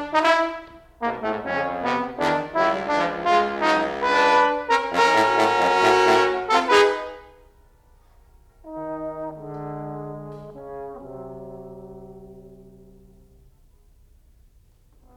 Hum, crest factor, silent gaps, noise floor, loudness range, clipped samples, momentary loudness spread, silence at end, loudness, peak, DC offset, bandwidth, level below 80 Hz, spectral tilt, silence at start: none; 18 dB; none; -55 dBFS; 20 LU; under 0.1%; 21 LU; 2.55 s; -21 LUFS; -4 dBFS; under 0.1%; 14.5 kHz; -54 dBFS; -4 dB/octave; 0 s